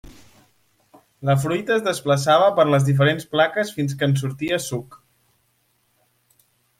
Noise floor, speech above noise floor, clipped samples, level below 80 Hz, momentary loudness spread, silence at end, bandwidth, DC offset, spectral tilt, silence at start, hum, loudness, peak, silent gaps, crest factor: -66 dBFS; 47 dB; under 0.1%; -58 dBFS; 9 LU; 1.85 s; 16 kHz; under 0.1%; -5.5 dB/octave; 0.05 s; none; -20 LUFS; -4 dBFS; none; 18 dB